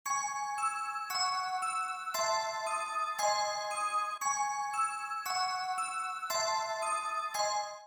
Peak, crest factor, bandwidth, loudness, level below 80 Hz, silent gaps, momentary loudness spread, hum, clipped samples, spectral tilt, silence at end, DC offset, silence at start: -18 dBFS; 16 dB; 19.5 kHz; -33 LUFS; -84 dBFS; none; 3 LU; none; under 0.1%; 1.5 dB/octave; 0 s; under 0.1%; 0.05 s